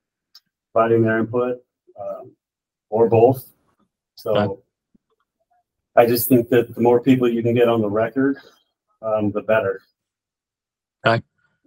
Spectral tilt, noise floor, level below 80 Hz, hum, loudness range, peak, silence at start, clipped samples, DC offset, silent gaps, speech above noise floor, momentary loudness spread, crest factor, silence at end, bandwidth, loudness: -6.5 dB/octave; -89 dBFS; -64 dBFS; none; 6 LU; 0 dBFS; 0.75 s; under 0.1%; under 0.1%; none; 71 dB; 17 LU; 20 dB; 0.45 s; 16 kHz; -19 LUFS